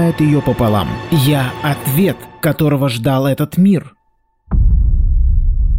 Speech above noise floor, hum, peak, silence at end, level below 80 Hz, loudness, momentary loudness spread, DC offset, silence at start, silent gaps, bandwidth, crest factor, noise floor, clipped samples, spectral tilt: 46 dB; none; -2 dBFS; 0 s; -18 dBFS; -15 LUFS; 5 LU; under 0.1%; 0 s; none; 16 kHz; 10 dB; -60 dBFS; under 0.1%; -7 dB/octave